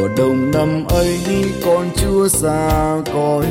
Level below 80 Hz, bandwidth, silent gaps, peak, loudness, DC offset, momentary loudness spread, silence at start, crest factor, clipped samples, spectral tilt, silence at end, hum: -28 dBFS; 17 kHz; none; -4 dBFS; -16 LUFS; under 0.1%; 3 LU; 0 s; 12 dB; under 0.1%; -5.5 dB/octave; 0 s; none